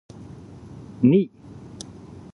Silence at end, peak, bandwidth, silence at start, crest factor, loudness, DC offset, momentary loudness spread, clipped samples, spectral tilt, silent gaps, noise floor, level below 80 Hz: 1.05 s; -6 dBFS; 11 kHz; 1 s; 20 dB; -21 LUFS; under 0.1%; 24 LU; under 0.1%; -8 dB/octave; none; -42 dBFS; -54 dBFS